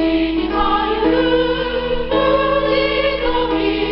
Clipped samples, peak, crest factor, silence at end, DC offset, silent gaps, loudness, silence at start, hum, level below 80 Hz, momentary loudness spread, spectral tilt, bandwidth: under 0.1%; -4 dBFS; 12 dB; 0 s; 0.2%; none; -17 LUFS; 0 s; none; -30 dBFS; 3 LU; -2.5 dB/octave; 5.8 kHz